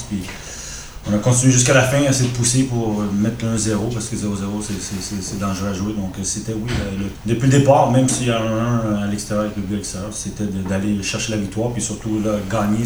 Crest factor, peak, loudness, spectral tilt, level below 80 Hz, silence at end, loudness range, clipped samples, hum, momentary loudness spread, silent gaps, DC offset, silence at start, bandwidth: 18 dB; 0 dBFS; -19 LUFS; -5 dB/octave; -38 dBFS; 0 s; 6 LU; under 0.1%; none; 12 LU; none; under 0.1%; 0 s; over 20 kHz